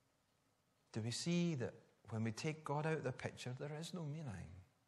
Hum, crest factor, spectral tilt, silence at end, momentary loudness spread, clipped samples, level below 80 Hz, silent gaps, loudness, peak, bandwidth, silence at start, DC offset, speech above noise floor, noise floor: none; 18 dB; -5.5 dB/octave; 0.25 s; 12 LU; under 0.1%; -76 dBFS; none; -44 LUFS; -28 dBFS; 12 kHz; 0.95 s; under 0.1%; 37 dB; -80 dBFS